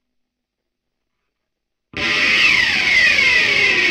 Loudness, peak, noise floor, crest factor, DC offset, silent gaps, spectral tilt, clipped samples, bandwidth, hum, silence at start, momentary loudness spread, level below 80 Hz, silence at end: -12 LUFS; -2 dBFS; -78 dBFS; 16 dB; under 0.1%; none; -1 dB/octave; under 0.1%; 16 kHz; none; 1.95 s; 8 LU; -48 dBFS; 0 s